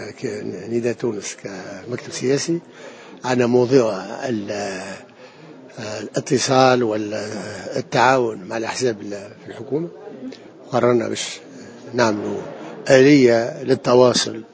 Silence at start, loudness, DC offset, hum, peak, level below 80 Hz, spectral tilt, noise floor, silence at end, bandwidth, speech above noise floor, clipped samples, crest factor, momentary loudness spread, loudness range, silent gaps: 0 s; -19 LUFS; under 0.1%; none; 0 dBFS; -62 dBFS; -5 dB/octave; -42 dBFS; 0.05 s; 8 kHz; 23 dB; under 0.1%; 20 dB; 20 LU; 6 LU; none